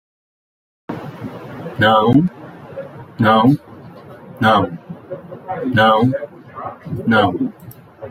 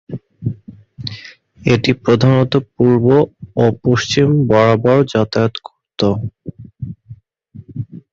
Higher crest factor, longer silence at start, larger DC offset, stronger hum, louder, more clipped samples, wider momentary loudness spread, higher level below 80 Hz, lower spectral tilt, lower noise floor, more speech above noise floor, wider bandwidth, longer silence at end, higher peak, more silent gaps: about the same, 16 dB vs 16 dB; first, 0.9 s vs 0.1 s; neither; neither; about the same, -16 LUFS vs -14 LUFS; neither; about the same, 21 LU vs 20 LU; second, -54 dBFS vs -44 dBFS; about the same, -7.5 dB/octave vs -7 dB/octave; about the same, -37 dBFS vs -40 dBFS; second, 23 dB vs 27 dB; first, 15.5 kHz vs 7.6 kHz; second, 0 s vs 0.15 s; about the same, -2 dBFS vs 0 dBFS; neither